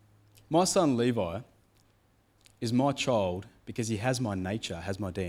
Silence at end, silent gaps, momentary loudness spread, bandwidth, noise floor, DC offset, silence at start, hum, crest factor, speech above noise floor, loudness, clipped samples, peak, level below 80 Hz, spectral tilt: 0 s; none; 11 LU; 16 kHz; -67 dBFS; under 0.1%; 0.5 s; none; 18 dB; 38 dB; -30 LUFS; under 0.1%; -12 dBFS; -60 dBFS; -5 dB/octave